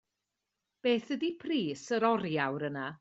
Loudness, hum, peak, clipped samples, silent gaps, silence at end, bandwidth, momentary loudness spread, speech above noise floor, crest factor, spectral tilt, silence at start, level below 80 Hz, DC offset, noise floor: -32 LUFS; none; -12 dBFS; under 0.1%; none; 0.05 s; 8 kHz; 6 LU; 55 dB; 20 dB; -5.5 dB/octave; 0.85 s; -76 dBFS; under 0.1%; -87 dBFS